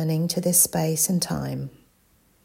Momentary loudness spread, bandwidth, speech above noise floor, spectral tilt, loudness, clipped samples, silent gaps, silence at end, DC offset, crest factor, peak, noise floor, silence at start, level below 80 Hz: 15 LU; 16.5 kHz; 38 dB; -4 dB/octave; -22 LUFS; under 0.1%; none; 0.75 s; under 0.1%; 20 dB; -4 dBFS; -62 dBFS; 0 s; -56 dBFS